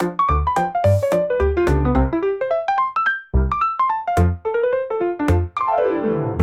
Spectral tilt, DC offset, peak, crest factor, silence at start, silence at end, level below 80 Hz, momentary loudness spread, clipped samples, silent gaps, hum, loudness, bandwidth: -8 dB/octave; 0.1%; -6 dBFS; 14 dB; 0 s; 0 s; -28 dBFS; 3 LU; under 0.1%; none; none; -19 LUFS; 14 kHz